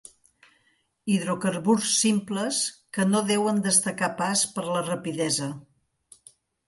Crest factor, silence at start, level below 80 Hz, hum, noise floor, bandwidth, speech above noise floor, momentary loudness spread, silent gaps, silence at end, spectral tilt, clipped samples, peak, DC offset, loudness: 20 dB; 1.05 s; -70 dBFS; none; -69 dBFS; 12 kHz; 44 dB; 7 LU; none; 1.05 s; -3.5 dB/octave; under 0.1%; -6 dBFS; under 0.1%; -24 LUFS